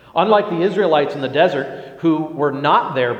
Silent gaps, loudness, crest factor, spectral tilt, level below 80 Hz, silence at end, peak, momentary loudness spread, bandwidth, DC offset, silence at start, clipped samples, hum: none; -17 LUFS; 16 dB; -7 dB/octave; -64 dBFS; 0 s; 0 dBFS; 6 LU; 8.2 kHz; under 0.1%; 0.15 s; under 0.1%; none